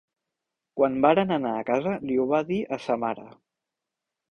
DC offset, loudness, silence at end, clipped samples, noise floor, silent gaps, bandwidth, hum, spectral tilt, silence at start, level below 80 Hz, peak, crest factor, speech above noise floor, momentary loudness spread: under 0.1%; -25 LUFS; 1.05 s; under 0.1%; -86 dBFS; none; 8.8 kHz; none; -7.5 dB/octave; 0.75 s; -64 dBFS; -6 dBFS; 22 dB; 62 dB; 9 LU